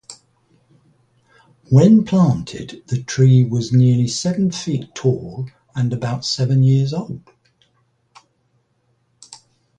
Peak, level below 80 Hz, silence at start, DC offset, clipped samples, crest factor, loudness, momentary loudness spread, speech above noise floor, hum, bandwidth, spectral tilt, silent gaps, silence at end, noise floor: -2 dBFS; -52 dBFS; 0.1 s; under 0.1%; under 0.1%; 18 dB; -17 LUFS; 17 LU; 48 dB; none; 9.2 kHz; -7 dB/octave; none; 0.45 s; -64 dBFS